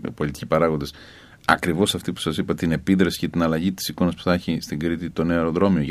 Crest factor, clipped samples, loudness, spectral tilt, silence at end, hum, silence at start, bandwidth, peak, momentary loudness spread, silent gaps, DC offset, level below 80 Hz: 22 dB; under 0.1%; -22 LUFS; -5.5 dB/octave; 0 s; none; 0 s; 15.5 kHz; 0 dBFS; 7 LU; none; under 0.1%; -44 dBFS